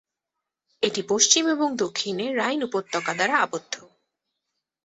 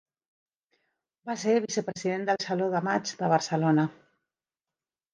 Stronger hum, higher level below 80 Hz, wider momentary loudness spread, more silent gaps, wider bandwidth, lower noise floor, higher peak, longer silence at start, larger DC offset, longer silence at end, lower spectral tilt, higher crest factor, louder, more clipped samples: neither; first, -72 dBFS vs -78 dBFS; first, 10 LU vs 7 LU; neither; second, 8.4 kHz vs 10 kHz; second, -85 dBFS vs under -90 dBFS; first, -2 dBFS vs -10 dBFS; second, 0.8 s vs 1.25 s; neither; second, 1 s vs 1.2 s; second, -1.5 dB/octave vs -5.5 dB/octave; about the same, 24 dB vs 20 dB; first, -23 LUFS vs -28 LUFS; neither